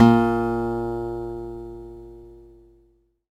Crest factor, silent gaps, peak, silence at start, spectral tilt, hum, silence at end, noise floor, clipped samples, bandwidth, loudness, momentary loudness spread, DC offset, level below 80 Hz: 22 dB; none; 0 dBFS; 0 s; -8.5 dB/octave; none; 0.95 s; -62 dBFS; under 0.1%; 8.8 kHz; -24 LUFS; 23 LU; under 0.1%; -44 dBFS